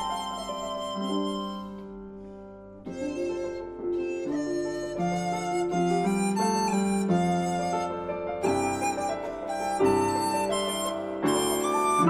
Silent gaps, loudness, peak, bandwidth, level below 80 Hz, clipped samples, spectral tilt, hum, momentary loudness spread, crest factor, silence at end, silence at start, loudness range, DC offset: none; -28 LUFS; -10 dBFS; 15.5 kHz; -56 dBFS; under 0.1%; -5 dB/octave; none; 11 LU; 18 dB; 0 s; 0 s; 7 LU; under 0.1%